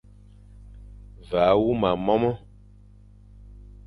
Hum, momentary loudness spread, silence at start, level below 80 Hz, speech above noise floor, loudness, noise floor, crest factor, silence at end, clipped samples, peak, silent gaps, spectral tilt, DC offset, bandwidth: 50 Hz at -45 dBFS; 9 LU; 0.6 s; -46 dBFS; 28 dB; -23 LUFS; -50 dBFS; 20 dB; 0.3 s; under 0.1%; -6 dBFS; none; -8.5 dB/octave; under 0.1%; 10.5 kHz